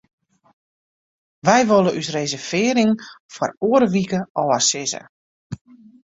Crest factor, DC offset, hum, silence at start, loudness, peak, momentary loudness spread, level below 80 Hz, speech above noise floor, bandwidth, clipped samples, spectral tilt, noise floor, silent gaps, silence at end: 20 dB; under 0.1%; none; 1.45 s; -19 LUFS; 0 dBFS; 19 LU; -60 dBFS; over 71 dB; 8 kHz; under 0.1%; -4 dB/octave; under -90 dBFS; 3.20-3.29 s, 3.57-3.61 s, 4.30-4.35 s, 5.09-5.50 s; 0.5 s